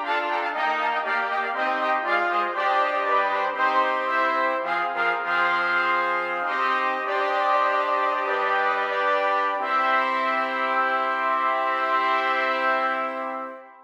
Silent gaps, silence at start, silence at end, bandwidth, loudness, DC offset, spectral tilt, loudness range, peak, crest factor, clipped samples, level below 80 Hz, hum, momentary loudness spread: none; 0 s; 0.1 s; 14 kHz; -23 LUFS; under 0.1%; -3 dB/octave; 1 LU; -10 dBFS; 14 dB; under 0.1%; -80 dBFS; none; 3 LU